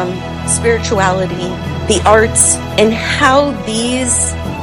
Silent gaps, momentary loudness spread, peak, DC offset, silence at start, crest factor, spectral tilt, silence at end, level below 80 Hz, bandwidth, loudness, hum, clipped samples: none; 11 LU; 0 dBFS; under 0.1%; 0 s; 14 dB; -3.5 dB/octave; 0 s; -30 dBFS; over 20 kHz; -12 LUFS; none; 0.3%